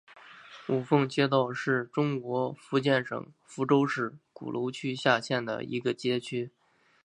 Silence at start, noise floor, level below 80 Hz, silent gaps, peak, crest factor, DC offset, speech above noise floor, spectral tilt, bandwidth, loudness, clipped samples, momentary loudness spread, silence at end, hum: 0.1 s; -50 dBFS; -76 dBFS; none; -8 dBFS; 20 dB; under 0.1%; 21 dB; -6 dB/octave; 10.5 kHz; -29 LUFS; under 0.1%; 13 LU; 0.55 s; none